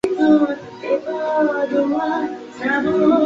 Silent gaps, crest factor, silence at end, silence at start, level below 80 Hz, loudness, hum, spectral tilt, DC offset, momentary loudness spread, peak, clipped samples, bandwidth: none; 14 dB; 0 s; 0.05 s; -58 dBFS; -19 LUFS; none; -6.5 dB/octave; under 0.1%; 9 LU; -4 dBFS; under 0.1%; 7.8 kHz